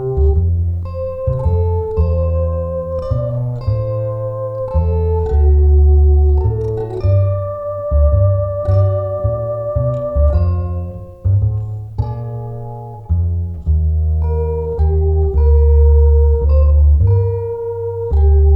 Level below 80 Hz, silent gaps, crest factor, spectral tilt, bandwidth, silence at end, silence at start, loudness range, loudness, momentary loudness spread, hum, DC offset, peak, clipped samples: -16 dBFS; none; 10 dB; -12 dB/octave; 2.5 kHz; 0 s; 0 s; 6 LU; -16 LUFS; 11 LU; none; under 0.1%; -2 dBFS; under 0.1%